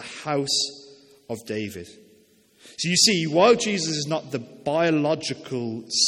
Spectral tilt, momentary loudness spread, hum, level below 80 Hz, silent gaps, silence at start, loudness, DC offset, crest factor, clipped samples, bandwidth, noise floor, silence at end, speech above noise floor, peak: -3 dB/octave; 16 LU; none; -66 dBFS; none; 0 s; -23 LUFS; under 0.1%; 22 dB; under 0.1%; 16.5 kHz; -58 dBFS; 0 s; 34 dB; -4 dBFS